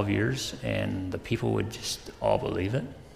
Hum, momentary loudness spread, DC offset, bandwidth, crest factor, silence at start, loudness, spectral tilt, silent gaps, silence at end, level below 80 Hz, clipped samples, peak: none; 6 LU; under 0.1%; 15.5 kHz; 18 dB; 0 s; -30 LUFS; -5.5 dB/octave; none; 0 s; -50 dBFS; under 0.1%; -10 dBFS